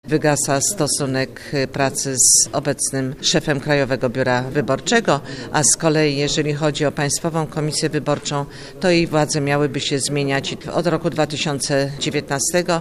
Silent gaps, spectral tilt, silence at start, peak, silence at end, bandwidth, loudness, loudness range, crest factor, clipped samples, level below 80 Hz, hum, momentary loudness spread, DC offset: none; -3.5 dB/octave; 0.05 s; 0 dBFS; 0 s; 14.5 kHz; -18 LUFS; 3 LU; 18 dB; under 0.1%; -46 dBFS; none; 8 LU; under 0.1%